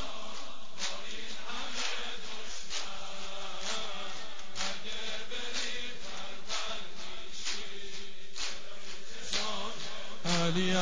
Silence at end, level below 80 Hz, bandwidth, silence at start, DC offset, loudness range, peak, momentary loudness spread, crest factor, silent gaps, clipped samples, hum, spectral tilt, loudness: 0 s; -62 dBFS; 8 kHz; 0 s; 3%; 2 LU; -14 dBFS; 10 LU; 22 dB; none; under 0.1%; none; -2.5 dB/octave; -37 LUFS